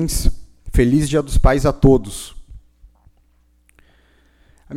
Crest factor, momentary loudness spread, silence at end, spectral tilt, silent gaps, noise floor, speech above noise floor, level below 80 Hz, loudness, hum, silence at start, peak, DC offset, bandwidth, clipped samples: 18 dB; 17 LU; 0 s; -6 dB/octave; none; -57 dBFS; 42 dB; -24 dBFS; -17 LUFS; none; 0 s; -2 dBFS; under 0.1%; 15.5 kHz; under 0.1%